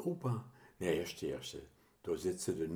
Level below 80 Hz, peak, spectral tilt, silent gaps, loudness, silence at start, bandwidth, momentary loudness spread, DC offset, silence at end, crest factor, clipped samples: -66 dBFS; -20 dBFS; -5.5 dB/octave; none; -40 LUFS; 0 s; over 20 kHz; 12 LU; under 0.1%; 0 s; 20 dB; under 0.1%